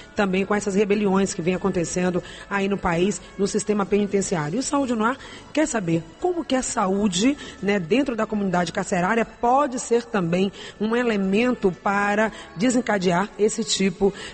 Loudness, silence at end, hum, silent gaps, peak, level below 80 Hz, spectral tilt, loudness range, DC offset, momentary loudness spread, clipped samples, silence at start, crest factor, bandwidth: -23 LUFS; 0 s; none; none; -8 dBFS; -50 dBFS; -5 dB/octave; 2 LU; under 0.1%; 5 LU; under 0.1%; 0 s; 14 dB; 8.8 kHz